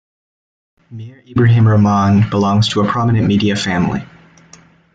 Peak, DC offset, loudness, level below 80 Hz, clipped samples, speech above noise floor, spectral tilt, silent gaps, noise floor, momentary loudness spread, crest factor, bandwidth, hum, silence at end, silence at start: -2 dBFS; under 0.1%; -14 LUFS; -44 dBFS; under 0.1%; 32 dB; -7 dB/octave; none; -45 dBFS; 13 LU; 12 dB; 8 kHz; none; 0.9 s; 0.9 s